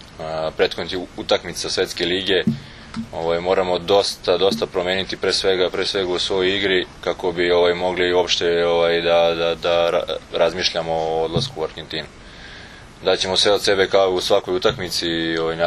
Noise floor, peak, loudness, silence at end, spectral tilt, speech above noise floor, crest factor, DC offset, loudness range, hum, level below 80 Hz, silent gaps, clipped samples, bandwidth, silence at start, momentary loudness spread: -40 dBFS; -2 dBFS; -19 LUFS; 0 s; -3.5 dB/octave; 20 dB; 18 dB; under 0.1%; 4 LU; none; -46 dBFS; none; under 0.1%; 13.5 kHz; 0 s; 11 LU